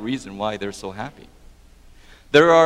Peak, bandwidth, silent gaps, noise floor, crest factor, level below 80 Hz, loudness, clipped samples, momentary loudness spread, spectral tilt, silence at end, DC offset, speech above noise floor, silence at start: 0 dBFS; 13 kHz; none; -48 dBFS; 20 dB; -50 dBFS; -21 LUFS; under 0.1%; 19 LU; -5 dB/octave; 0 s; under 0.1%; 29 dB; 0 s